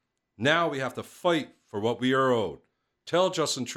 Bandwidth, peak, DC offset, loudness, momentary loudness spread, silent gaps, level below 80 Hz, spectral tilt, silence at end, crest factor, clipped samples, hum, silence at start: 16 kHz; -8 dBFS; under 0.1%; -27 LUFS; 10 LU; none; -68 dBFS; -4 dB/octave; 0 s; 20 dB; under 0.1%; none; 0.4 s